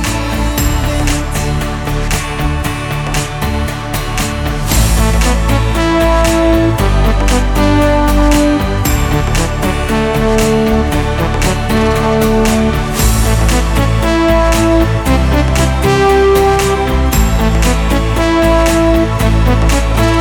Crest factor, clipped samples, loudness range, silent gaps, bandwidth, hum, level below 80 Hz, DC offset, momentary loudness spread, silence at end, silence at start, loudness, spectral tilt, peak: 10 dB; under 0.1%; 5 LU; none; 19 kHz; none; -16 dBFS; under 0.1%; 6 LU; 0 s; 0 s; -12 LUFS; -5.5 dB/octave; 0 dBFS